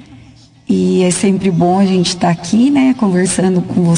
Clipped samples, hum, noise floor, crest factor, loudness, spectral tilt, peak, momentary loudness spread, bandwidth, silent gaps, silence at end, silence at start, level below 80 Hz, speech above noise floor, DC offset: under 0.1%; none; -41 dBFS; 10 dB; -13 LUFS; -5.5 dB/octave; -2 dBFS; 3 LU; 10.5 kHz; none; 0 s; 0.1 s; -48 dBFS; 30 dB; under 0.1%